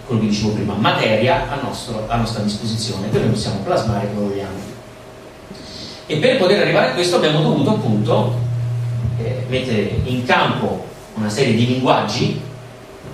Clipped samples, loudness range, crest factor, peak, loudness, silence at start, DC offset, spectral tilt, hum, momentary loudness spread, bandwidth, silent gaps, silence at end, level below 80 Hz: under 0.1%; 5 LU; 18 dB; 0 dBFS; -18 LUFS; 0 s; under 0.1%; -6 dB/octave; none; 17 LU; 13.5 kHz; none; 0 s; -42 dBFS